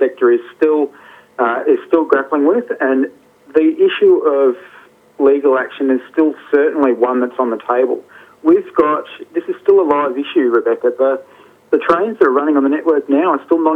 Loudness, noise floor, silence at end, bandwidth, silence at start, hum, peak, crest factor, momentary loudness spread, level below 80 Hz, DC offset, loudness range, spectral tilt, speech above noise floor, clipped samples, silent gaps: -15 LUFS; -33 dBFS; 0 s; 4.2 kHz; 0 s; none; 0 dBFS; 14 dB; 7 LU; -62 dBFS; under 0.1%; 1 LU; -7 dB/octave; 19 dB; under 0.1%; none